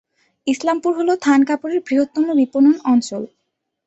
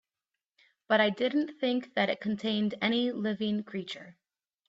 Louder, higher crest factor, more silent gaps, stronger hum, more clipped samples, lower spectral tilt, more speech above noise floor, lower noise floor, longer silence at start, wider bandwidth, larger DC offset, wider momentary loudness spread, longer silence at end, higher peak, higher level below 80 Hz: first, -17 LUFS vs -30 LUFS; about the same, 14 dB vs 18 dB; neither; neither; neither; second, -4.5 dB/octave vs -6.5 dB/octave; about the same, 58 dB vs 60 dB; second, -74 dBFS vs -90 dBFS; second, 0.45 s vs 0.9 s; about the same, 8.2 kHz vs 7.8 kHz; neither; about the same, 13 LU vs 11 LU; about the same, 0.6 s vs 0.55 s; first, -4 dBFS vs -12 dBFS; first, -64 dBFS vs -74 dBFS